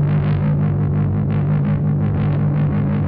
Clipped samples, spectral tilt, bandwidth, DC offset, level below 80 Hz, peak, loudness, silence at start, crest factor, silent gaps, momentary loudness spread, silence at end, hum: under 0.1%; -13 dB/octave; 3.8 kHz; under 0.1%; -36 dBFS; -10 dBFS; -18 LUFS; 0 s; 8 dB; none; 1 LU; 0 s; none